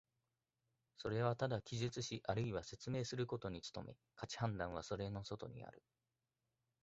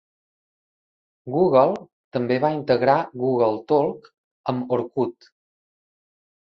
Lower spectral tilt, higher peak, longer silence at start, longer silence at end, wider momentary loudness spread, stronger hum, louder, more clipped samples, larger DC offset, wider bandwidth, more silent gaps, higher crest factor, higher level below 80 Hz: second, -5.5 dB/octave vs -9 dB/octave; second, -24 dBFS vs -4 dBFS; second, 1 s vs 1.25 s; second, 1.05 s vs 1.35 s; about the same, 13 LU vs 13 LU; neither; second, -44 LUFS vs -22 LUFS; neither; neither; first, 8 kHz vs 6.2 kHz; second, none vs 1.93-2.11 s, 4.18-4.44 s; about the same, 22 dB vs 20 dB; about the same, -66 dBFS vs -64 dBFS